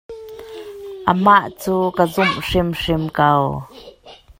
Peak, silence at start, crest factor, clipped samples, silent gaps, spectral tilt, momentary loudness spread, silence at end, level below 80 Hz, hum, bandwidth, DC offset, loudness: 0 dBFS; 0.1 s; 18 dB; under 0.1%; none; -6 dB/octave; 21 LU; 0.25 s; -40 dBFS; none; 16.5 kHz; under 0.1%; -17 LUFS